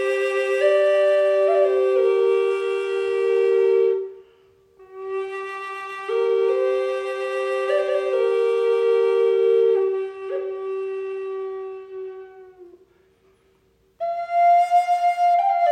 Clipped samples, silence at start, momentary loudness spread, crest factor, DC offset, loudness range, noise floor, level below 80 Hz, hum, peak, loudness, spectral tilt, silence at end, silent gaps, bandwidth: under 0.1%; 0 s; 13 LU; 14 dB; under 0.1%; 12 LU; -61 dBFS; -74 dBFS; none; -8 dBFS; -21 LUFS; -3 dB/octave; 0 s; none; 10.5 kHz